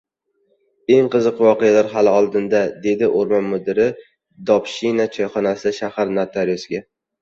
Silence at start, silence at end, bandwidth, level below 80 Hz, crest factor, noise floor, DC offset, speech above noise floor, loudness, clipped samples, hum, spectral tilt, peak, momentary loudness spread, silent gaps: 0.9 s; 0.4 s; 7.6 kHz; -60 dBFS; 16 dB; -65 dBFS; under 0.1%; 48 dB; -18 LUFS; under 0.1%; none; -6 dB/octave; -2 dBFS; 8 LU; none